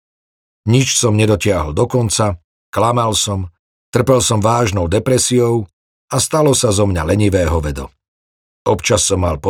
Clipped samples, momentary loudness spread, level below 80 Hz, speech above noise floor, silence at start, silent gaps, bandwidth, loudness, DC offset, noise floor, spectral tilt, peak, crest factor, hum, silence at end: under 0.1%; 11 LU; -36 dBFS; over 76 dB; 0.65 s; 2.44-2.73 s, 3.59-3.93 s, 5.73-6.08 s, 8.08-8.65 s; 16.5 kHz; -15 LUFS; under 0.1%; under -90 dBFS; -4.5 dB/octave; 0 dBFS; 14 dB; none; 0 s